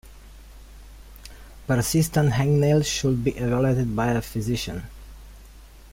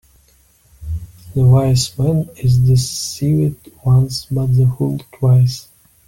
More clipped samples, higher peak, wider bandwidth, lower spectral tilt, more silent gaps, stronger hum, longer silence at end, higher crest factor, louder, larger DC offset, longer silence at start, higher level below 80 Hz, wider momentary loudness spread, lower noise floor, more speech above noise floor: neither; second, -8 dBFS vs -2 dBFS; about the same, 16.5 kHz vs 16 kHz; about the same, -6 dB/octave vs -6.5 dB/octave; neither; neither; second, 0.05 s vs 0.45 s; about the same, 16 dB vs 14 dB; second, -23 LUFS vs -16 LUFS; neither; second, 0.05 s vs 0.8 s; about the same, -42 dBFS vs -38 dBFS; first, 23 LU vs 15 LU; second, -46 dBFS vs -53 dBFS; second, 24 dB vs 39 dB